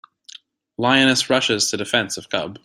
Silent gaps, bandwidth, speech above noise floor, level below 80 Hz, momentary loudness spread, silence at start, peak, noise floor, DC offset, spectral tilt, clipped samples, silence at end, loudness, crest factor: none; 16 kHz; 26 dB; -60 dBFS; 10 LU; 0.8 s; -2 dBFS; -46 dBFS; under 0.1%; -2.5 dB/octave; under 0.1%; 0.05 s; -18 LUFS; 20 dB